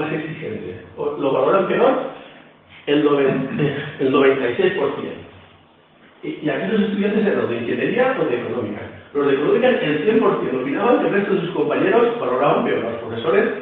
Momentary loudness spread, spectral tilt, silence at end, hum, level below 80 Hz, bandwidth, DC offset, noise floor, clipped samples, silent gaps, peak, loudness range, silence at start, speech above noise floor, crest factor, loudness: 13 LU; -9.5 dB/octave; 0 s; none; -60 dBFS; 4.3 kHz; under 0.1%; -51 dBFS; under 0.1%; none; -4 dBFS; 4 LU; 0 s; 33 dB; 16 dB; -19 LUFS